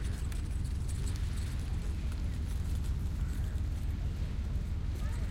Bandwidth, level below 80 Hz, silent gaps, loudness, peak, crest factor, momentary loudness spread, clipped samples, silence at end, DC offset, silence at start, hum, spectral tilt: 16 kHz; -36 dBFS; none; -37 LUFS; -24 dBFS; 10 dB; 1 LU; under 0.1%; 0 s; under 0.1%; 0 s; none; -6 dB/octave